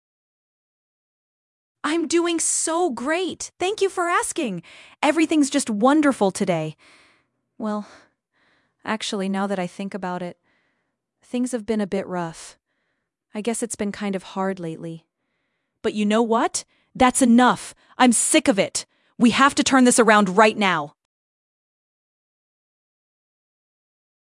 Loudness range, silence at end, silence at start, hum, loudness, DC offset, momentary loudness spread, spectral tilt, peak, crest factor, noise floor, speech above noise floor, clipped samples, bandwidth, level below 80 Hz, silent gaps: 12 LU; 3.4 s; 1.85 s; none; -21 LUFS; under 0.1%; 16 LU; -3.5 dB/octave; 0 dBFS; 22 dB; -75 dBFS; 55 dB; under 0.1%; 12 kHz; -60 dBFS; none